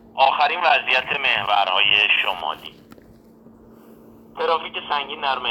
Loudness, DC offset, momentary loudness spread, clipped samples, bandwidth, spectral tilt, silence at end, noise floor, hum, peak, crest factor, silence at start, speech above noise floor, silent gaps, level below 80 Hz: -19 LUFS; under 0.1%; 12 LU; under 0.1%; 17 kHz; -2.5 dB/octave; 0 s; -48 dBFS; none; -4 dBFS; 18 dB; 0.15 s; 28 dB; none; -60 dBFS